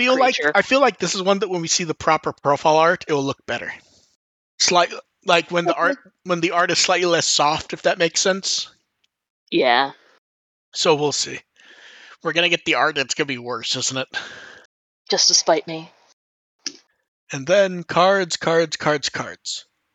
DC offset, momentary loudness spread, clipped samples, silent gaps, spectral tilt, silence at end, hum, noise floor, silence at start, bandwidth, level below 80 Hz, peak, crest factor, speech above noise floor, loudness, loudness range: under 0.1%; 14 LU; under 0.1%; 4.15-4.58 s, 9.30-9.47 s, 10.18-10.72 s, 14.65-15.05 s, 16.13-16.59 s, 17.08-17.27 s; -2.5 dB/octave; 0.35 s; none; -71 dBFS; 0 s; 9.2 kHz; -64 dBFS; -2 dBFS; 20 dB; 51 dB; -19 LUFS; 3 LU